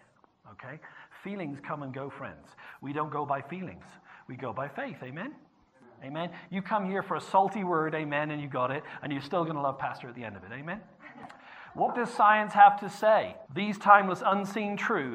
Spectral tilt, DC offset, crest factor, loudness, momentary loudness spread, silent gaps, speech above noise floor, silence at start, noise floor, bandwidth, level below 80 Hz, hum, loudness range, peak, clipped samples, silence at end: -6 dB/octave; under 0.1%; 26 dB; -28 LUFS; 24 LU; none; 30 dB; 0.45 s; -59 dBFS; 10 kHz; -74 dBFS; none; 13 LU; -4 dBFS; under 0.1%; 0 s